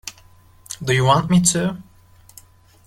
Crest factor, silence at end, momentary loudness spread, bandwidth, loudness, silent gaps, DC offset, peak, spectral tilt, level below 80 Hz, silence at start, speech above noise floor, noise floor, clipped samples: 20 dB; 1.05 s; 21 LU; 15.5 kHz; -18 LUFS; none; under 0.1%; -2 dBFS; -4.5 dB/octave; -48 dBFS; 0.05 s; 33 dB; -49 dBFS; under 0.1%